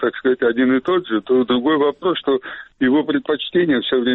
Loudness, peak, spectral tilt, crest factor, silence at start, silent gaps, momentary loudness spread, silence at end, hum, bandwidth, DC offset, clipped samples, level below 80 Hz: -18 LUFS; -8 dBFS; -8.5 dB/octave; 10 dB; 0 s; none; 5 LU; 0 s; none; 4.1 kHz; under 0.1%; under 0.1%; -56 dBFS